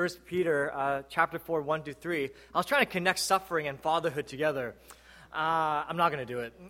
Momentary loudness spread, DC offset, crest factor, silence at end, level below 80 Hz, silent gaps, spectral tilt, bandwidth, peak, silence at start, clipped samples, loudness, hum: 7 LU; under 0.1%; 22 dB; 0 s; -64 dBFS; none; -4 dB/octave; 16.5 kHz; -8 dBFS; 0 s; under 0.1%; -30 LUFS; none